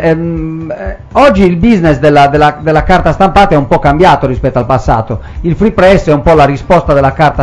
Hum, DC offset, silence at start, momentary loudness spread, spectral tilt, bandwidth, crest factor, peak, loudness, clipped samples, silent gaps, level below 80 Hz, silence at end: none; under 0.1%; 0 s; 10 LU; -7.5 dB/octave; 12 kHz; 8 dB; 0 dBFS; -8 LUFS; 7%; none; -22 dBFS; 0 s